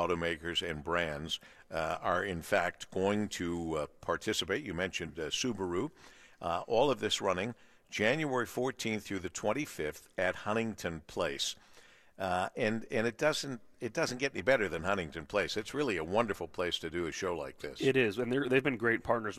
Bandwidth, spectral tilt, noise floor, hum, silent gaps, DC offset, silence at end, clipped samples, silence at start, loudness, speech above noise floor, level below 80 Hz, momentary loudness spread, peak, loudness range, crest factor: 14.5 kHz; -4 dB/octave; -59 dBFS; none; none; under 0.1%; 0 s; under 0.1%; 0 s; -34 LUFS; 25 dB; -60 dBFS; 9 LU; -14 dBFS; 3 LU; 20 dB